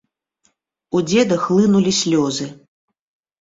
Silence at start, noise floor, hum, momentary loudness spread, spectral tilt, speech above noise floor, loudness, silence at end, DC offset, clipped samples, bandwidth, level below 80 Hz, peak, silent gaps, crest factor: 0.95 s; -65 dBFS; none; 9 LU; -5 dB/octave; 49 dB; -17 LUFS; 0.85 s; under 0.1%; under 0.1%; 7.8 kHz; -58 dBFS; -4 dBFS; none; 16 dB